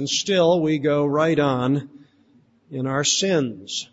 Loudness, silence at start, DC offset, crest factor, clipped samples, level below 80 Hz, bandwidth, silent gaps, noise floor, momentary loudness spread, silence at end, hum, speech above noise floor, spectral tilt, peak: -21 LUFS; 0 s; under 0.1%; 16 dB; under 0.1%; -60 dBFS; 8 kHz; none; -57 dBFS; 9 LU; 0.1 s; none; 37 dB; -4 dB/octave; -6 dBFS